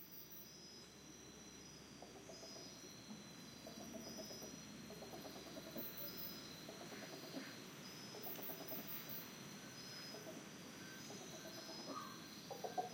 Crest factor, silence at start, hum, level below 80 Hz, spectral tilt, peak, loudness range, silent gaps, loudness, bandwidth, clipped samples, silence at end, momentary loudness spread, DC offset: 22 dB; 0 s; none; -78 dBFS; -3 dB/octave; -30 dBFS; 5 LU; none; -52 LUFS; 16.5 kHz; under 0.1%; 0 s; 9 LU; under 0.1%